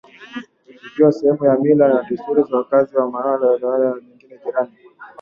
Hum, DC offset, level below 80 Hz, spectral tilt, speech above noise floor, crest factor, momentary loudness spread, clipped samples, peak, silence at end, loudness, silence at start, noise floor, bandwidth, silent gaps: none; under 0.1%; -64 dBFS; -9 dB/octave; 26 dB; 16 dB; 18 LU; under 0.1%; -2 dBFS; 0.15 s; -17 LUFS; 0.2 s; -43 dBFS; 6.8 kHz; none